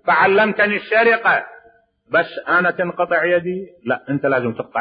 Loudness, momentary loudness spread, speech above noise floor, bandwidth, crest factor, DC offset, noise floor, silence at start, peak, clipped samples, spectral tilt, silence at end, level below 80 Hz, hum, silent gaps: -17 LUFS; 10 LU; 36 dB; 5.2 kHz; 14 dB; under 0.1%; -53 dBFS; 0.05 s; -4 dBFS; under 0.1%; -9.5 dB/octave; 0 s; -64 dBFS; none; none